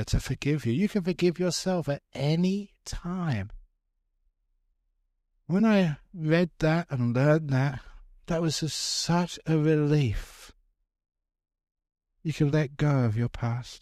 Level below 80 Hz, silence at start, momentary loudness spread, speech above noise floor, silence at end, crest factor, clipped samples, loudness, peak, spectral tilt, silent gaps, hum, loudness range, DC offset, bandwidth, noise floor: -46 dBFS; 0 s; 10 LU; 50 dB; 0.05 s; 18 dB; under 0.1%; -27 LUFS; -10 dBFS; -6 dB/octave; none; none; 5 LU; under 0.1%; 14 kHz; -76 dBFS